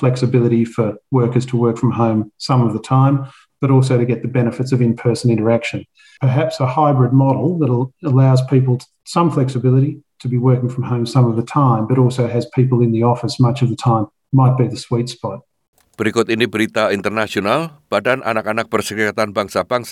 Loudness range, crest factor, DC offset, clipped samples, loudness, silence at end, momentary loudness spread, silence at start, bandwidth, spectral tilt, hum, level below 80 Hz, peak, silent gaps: 3 LU; 14 dB; under 0.1%; under 0.1%; -16 LUFS; 0 s; 7 LU; 0 s; 12 kHz; -7.5 dB/octave; none; -58 dBFS; -2 dBFS; 15.68-15.73 s